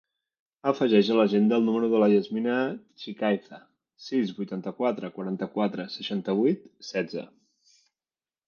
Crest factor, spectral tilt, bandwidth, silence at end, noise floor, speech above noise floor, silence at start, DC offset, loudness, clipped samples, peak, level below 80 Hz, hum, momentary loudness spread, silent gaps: 20 dB; -7 dB/octave; 6.8 kHz; 1.2 s; under -90 dBFS; over 64 dB; 0.65 s; under 0.1%; -26 LUFS; under 0.1%; -8 dBFS; -76 dBFS; none; 12 LU; none